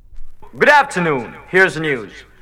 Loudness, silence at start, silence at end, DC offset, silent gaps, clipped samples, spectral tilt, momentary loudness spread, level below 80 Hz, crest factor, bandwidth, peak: -15 LUFS; 0.1 s; 0.2 s; under 0.1%; none; under 0.1%; -5 dB/octave; 12 LU; -40 dBFS; 16 dB; 16 kHz; 0 dBFS